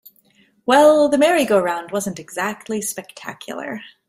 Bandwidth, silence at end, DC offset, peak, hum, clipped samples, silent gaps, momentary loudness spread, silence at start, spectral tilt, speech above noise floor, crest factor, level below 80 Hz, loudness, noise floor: 16 kHz; 0.2 s; under 0.1%; -2 dBFS; none; under 0.1%; none; 18 LU; 0.65 s; -3.5 dB/octave; 39 dB; 18 dB; -62 dBFS; -17 LUFS; -57 dBFS